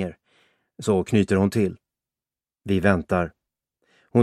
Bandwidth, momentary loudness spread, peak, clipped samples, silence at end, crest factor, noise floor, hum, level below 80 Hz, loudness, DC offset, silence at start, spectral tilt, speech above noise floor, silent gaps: 13.5 kHz; 11 LU; -4 dBFS; under 0.1%; 0 s; 22 dB; under -90 dBFS; none; -52 dBFS; -23 LUFS; under 0.1%; 0 s; -7 dB/octave; over 69 dB; none